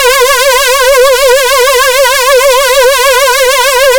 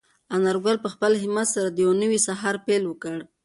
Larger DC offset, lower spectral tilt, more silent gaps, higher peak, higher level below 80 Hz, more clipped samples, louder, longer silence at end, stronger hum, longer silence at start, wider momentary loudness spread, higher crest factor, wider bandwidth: neither; second, 2.5 dB/octave vs -4 dB/octave; neither; first, 0 dBFS vs -8 dBFS; first, -32 dBFS vs -68 dBFS; neither; first, -5 LUFS vs -23 LUFS; second, 0 s vs 0.2 s; neither; second, 0 s vs 0.3 s; second, 1 LU vs 8 LU; second, 6 dB vs 14 dB; first, over 20 kHz vs 11.5 kHz